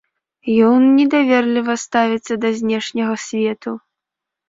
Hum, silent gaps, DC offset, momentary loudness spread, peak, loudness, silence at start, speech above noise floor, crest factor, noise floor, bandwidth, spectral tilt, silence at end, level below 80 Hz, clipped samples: none; none; under 0.1%; 12 LU; -2 dBFS; -16 LUFS; 0.45 s; 68 dB; 14 dB; -83 dBFS; 7.8 kHz; -4.5 dB/octave; 0.7 s; -62 dBFS; under 0.1%